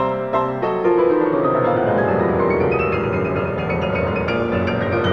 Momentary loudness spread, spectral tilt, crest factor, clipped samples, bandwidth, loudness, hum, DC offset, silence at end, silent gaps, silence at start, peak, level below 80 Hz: 4 LU; -8.5 dB/octave; 12 dB; under 0.1%; 6.6 kHz; -19 LUFS; none; 0.3%; 0 s; none; 0 s; -6 dBFS; -42 dBFS